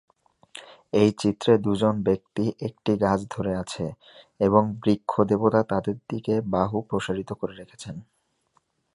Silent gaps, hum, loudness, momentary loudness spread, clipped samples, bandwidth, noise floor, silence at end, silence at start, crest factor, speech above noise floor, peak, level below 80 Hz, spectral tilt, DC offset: none; none; -25 LUFS; 18 LU; under 0.1%; 11 kHz; -69 dBFS; 0.9 s; 0.55 s; 20 dB; 45 dB; -4 dBFS; -54 dBFS; -7 dB/octave; under 0.1%